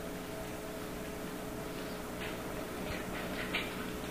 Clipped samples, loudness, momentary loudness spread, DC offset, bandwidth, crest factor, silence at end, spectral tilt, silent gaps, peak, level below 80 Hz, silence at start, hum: under 0.1%; -40 LUFS; 6 LU; 0.1%; 15.5 kHz; 20 dB; 0 s; -4.5 dB/octave; none; -20 dBFS; -52 dBFS; 0 s; none